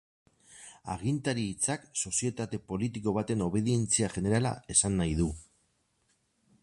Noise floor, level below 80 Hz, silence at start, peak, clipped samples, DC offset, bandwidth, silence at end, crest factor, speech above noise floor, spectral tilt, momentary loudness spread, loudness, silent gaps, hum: -74 dBFS; -50 dBFS; 0.5 s; -12 dBFS; under 0.1%; under 0.1%; 11.5 kHz; 1.2 s; 20 dB; 43 dB; -4.5 dB/octave; 11 LU; -30 LUFS; none; none